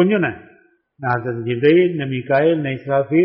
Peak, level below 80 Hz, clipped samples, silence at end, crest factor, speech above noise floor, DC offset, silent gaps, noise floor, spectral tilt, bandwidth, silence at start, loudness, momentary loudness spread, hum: -4 dBFS; -58 dBFS; under 0.1%; 0 s; 14 dB; 37 dB; under 0.1%; none; -54 dBFS; -6 dB/octave; 5.2 kHz; 0 s; -18 LUFS; 10 LU; none